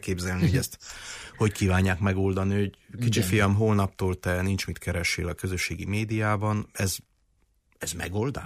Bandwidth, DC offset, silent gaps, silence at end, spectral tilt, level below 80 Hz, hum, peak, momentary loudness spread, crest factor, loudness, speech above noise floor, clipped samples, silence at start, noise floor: 15.5 kHz; under 0.1%; none; 0 s; -5.5 dB/octave; -48 dBFS; none; -12 dBFS; 10 LU; 14 dB; -27 LUFS; 41 dB; under 0.1%; 0.05 s; -68 dBFS